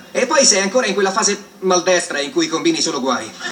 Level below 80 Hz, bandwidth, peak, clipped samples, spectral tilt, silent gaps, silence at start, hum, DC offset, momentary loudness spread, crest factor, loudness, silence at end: -68 dBFS; 18 kHz; 0 dBFS; under 0.1%; -2 dB/octave; none; 0 s; none; under 0.1%; 8 LU; 16 dB; -16 LUFS; 0 s